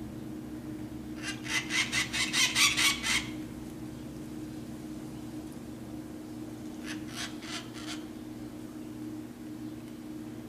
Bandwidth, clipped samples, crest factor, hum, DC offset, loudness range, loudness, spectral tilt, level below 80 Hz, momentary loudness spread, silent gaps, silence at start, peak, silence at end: 15 kHz; under 0.1%; 24 dB; none; under 0.1%; 14 LU; -33 LUFS; -2 dB/octave; -56 dBFS; 17 LU; none; 0 s; -10 dBFS; 0 s